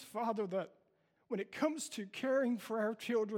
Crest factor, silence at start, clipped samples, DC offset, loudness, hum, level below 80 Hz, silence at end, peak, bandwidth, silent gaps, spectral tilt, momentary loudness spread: 16 dB; 0 s; under 0.1%; under 0.1%; -38 LUFS; none; -86 dBFS; 0 s; -22 dBFS; 17 kHz; none; -4.5 dB/octave; 8 LU